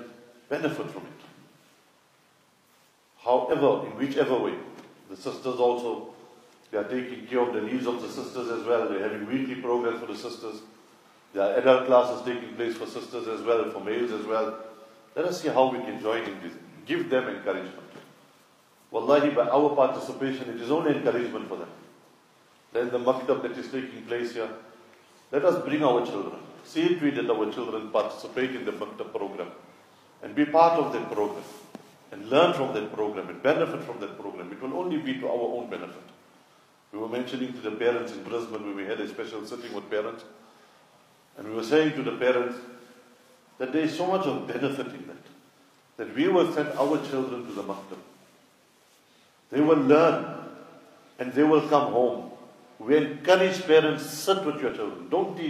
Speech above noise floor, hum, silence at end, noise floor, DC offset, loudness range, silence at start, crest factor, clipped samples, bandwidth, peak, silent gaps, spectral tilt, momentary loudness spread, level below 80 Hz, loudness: 36 dB; none; 0 s; -62 dBFS; under 0.1%; 7 LU; 0 s; 22 dB; under 0.1%; 15.5 kHz; -6 dBFS; none; -5.5 dB/octave; 17 LU; -80 dBFS; -27 LUFS